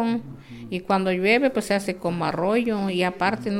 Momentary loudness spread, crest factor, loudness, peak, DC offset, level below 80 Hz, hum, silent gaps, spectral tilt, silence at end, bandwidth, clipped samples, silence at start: 13 LU; 18 dB; -23 LUFS; -6 dBFS; under 0.1%; -56 dBFS; none; none; -5.5 dB/octave; 0 s; 16 kHz; under 0.1%; 0 s